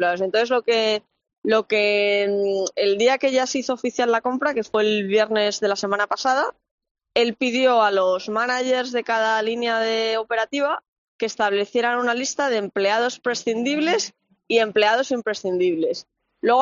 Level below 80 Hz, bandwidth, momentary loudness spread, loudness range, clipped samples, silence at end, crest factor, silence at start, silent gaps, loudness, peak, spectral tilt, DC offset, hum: -70 dBFS; 7.6 kHz; 6 LU; 2 LU; under 0.1%; 0 s; 18 dB; 0 s; 1.38-1.42 s, 6.71-6.78 s, 6.91-6.95 s, 10.88-11.19 s; -21 LUFS; -4 dBFS; -1 dB/octave; under 0.1%; none